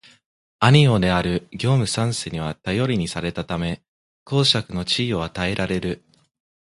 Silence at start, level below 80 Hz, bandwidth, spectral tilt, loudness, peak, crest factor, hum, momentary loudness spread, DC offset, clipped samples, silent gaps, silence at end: 0.6 s; -44 dBFS; 11.5 kHz; -5.5 dB/octave; -21 LUFS; 0 dBFS; 22 dB; none; 12 LU; under 0.1%; under 0.1%; 3.88-4.26 s; 0.75 s